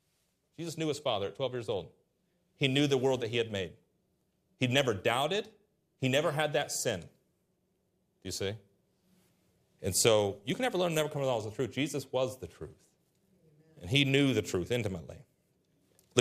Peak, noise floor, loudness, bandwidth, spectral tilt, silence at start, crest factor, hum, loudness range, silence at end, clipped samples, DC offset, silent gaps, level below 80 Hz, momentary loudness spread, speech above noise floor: -8 dBFS; -76 dBFS; -31 LUFS; 15.5 kHz; -4 dB/octave; 0.6 s; 26 dB; none; 4 LU; 0 s; under 0.1%; under 0.1%; none; -70 dBFS; 16 LU; 45 dB